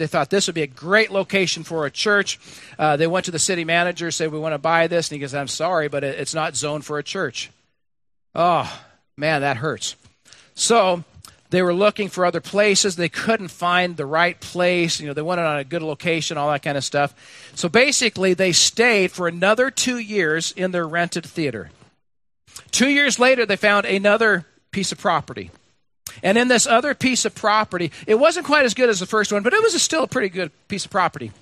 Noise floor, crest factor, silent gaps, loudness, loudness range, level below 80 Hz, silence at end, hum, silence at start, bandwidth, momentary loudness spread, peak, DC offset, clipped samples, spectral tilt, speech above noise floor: -80 dBFS; 20 dB; none; -19 LUFS; 6 LU; -62 dBFS; 0.1 s; none; 0 s; 14 kHz; 11 LU; 0 dBFS; under 0.1%; under 0.1%; -3 dB/octave; 60 dB